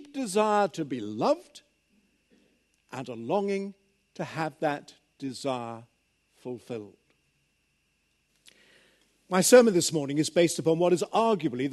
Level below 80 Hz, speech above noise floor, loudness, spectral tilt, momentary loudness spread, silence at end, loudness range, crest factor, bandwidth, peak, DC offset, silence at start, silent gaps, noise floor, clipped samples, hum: -76 dBFS; 47 dB; -26 LUFS; -4.5 dB/octave; 19 LU; 0 s; 16 LU; 24 dB; 12.5 kHz; -6 dBFS; under 0.1%; 0 s; none; -73 dBFS; under 0.1%; none